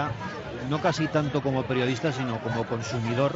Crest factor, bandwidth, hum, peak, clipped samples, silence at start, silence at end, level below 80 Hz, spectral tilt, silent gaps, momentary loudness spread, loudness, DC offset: 16 dB; 8 kHz; none; -10 dBFS; under 0.1%; 0 s; 0 s; -56 dBFS; -6 dB/octave; none; 6 LU; -28 LUFS; under 0.1%